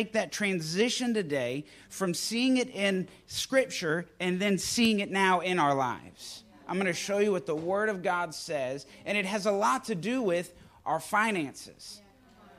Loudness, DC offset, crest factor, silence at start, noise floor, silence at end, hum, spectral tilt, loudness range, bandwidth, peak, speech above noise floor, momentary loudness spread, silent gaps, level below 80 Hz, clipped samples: -29 LUFS; under 0.1%; 18 dB; 0 s; -57 dBFS; 0.1 s; none; -4 dB/octave; 3 LU; 15.5 kHz; -12 dBFS; 27 dB; 15 LU; none; -66 dBFS; under 0.1%